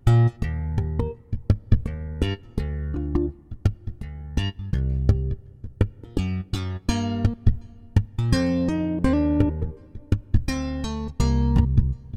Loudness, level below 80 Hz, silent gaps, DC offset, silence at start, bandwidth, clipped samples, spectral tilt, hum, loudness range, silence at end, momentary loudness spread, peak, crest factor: -25 LUFS; -28 dBFS; none; 0.2%; 0.05 s; 11 kHz; under 0.1%; -7.5 dB/octave; none; 4 LU; 0 s; 10 LU; -6 dBFS; 18 dB